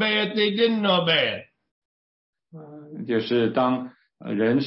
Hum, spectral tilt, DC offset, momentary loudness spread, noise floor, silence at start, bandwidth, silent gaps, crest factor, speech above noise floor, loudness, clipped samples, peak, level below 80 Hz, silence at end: none; -9.5 dB/octave; under 0.1%; 21 LU; -43 dBFS; 0 s; 5.8 kHz; 1.71-2.33 s; 16 dB; 21 dB; -22 LUFS; under 0.1%; -8 dBFS; -70 dBFS; 0 s